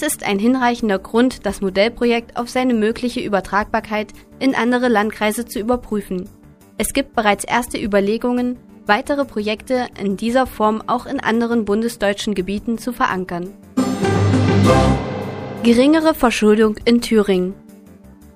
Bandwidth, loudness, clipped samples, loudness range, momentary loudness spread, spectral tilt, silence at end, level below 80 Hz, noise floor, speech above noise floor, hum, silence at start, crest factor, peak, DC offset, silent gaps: 15.5 kHz; -18 LUFS; under 0.1%; 5 LU; 10 LU; -5.5 dB/octave; 0.1 s; -38 dBFS; -43 dBFS; 25 dB; none; 0 s; 18 dB; 0 dBFS; under 0.1%; none